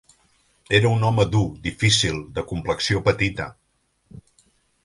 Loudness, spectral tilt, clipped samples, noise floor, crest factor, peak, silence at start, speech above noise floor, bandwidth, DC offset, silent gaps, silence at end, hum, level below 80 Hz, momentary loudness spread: -21 LUFS; -4.5 dB/octave; under 0.1%; -62 dBFS; 20 dB; -2 dBFS; 0.7 s; 41 dB; 11.5 kHz; under 0.1%; none; 0.65 s; none; -42 dBFS; 11 LU